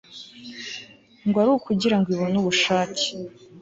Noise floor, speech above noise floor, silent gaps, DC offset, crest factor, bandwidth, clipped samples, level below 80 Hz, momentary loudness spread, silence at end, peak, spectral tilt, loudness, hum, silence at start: -43 dBFS; 21 dB; none; under 0.1%; 16 dB; 8 kHz; under 0.1%; -60 dBFS; 19 LU; 0 s; -8 dBFS; -4.5 dB/octave; -22 LUFS; none; 0.1 s